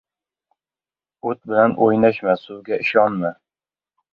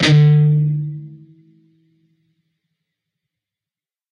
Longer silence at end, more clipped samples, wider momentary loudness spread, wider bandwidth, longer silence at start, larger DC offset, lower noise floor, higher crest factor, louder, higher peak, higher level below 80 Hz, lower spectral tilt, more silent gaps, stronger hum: second, 0.8 s vs 2.95 s; neither; second, 12 LU vs 18 LU; second, 5.6 kHz vs 8.8 kHz; first, 1.25 s vs 0 s; neither; about the same, under -90 dBFS vs under -90 dBFS; about the same, 20 dB vs 18 dB; second, -19 LUFS vs -15 LUFS; about the same, -2 dBFS vs -2 dBFS; second, -64 dBFS vs -56 dBFS; first, -8.5 dB/octave vs -6.5 dB/octave; neither; neither